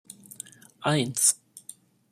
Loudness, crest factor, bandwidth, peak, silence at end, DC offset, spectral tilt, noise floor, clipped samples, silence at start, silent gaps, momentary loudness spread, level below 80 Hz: -24 LUFS; 24 dB; 15 kHz; -6 dBFS; 0.5 s; under 0.1%; -3 dB/octave; -51 dBFS; under 0.1%; 0.8 s; none; 24 LU; -70 dBFS